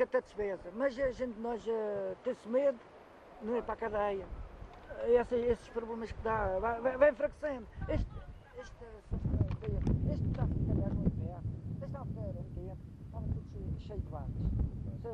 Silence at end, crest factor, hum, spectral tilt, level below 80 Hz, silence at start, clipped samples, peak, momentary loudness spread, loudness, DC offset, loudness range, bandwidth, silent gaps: 0 s; 20 dB; none; -9 dB/octave; -44 dBFS; 0 s; under 0.1%; -14 dBFS; 17 LU; -36 LUFS; under 0.1%; 7 LU; 9.4 kHz; none